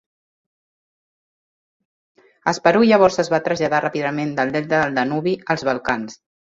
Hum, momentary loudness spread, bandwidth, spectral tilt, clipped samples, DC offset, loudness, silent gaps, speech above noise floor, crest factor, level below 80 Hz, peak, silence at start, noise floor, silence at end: none; 10 LU; 7.8 kHz; -5.5 dB/octave; under 0.1%; under 0.1%; -19 LUFS; none; over 72 dB; 18 dB; -58 dBFS; -2 dBFS; 2.45 s; under -90 dBFS; 0.3 s